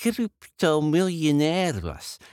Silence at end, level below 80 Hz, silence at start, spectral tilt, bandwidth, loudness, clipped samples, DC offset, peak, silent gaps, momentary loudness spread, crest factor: 0.05 s; -52 dBFS; 0 s; -5.5 dB/octave; 16.5 kHz; -24 LUFS; under 0.1%; under 0.1%; -10 dBFS; none; 11 LU; 14 dB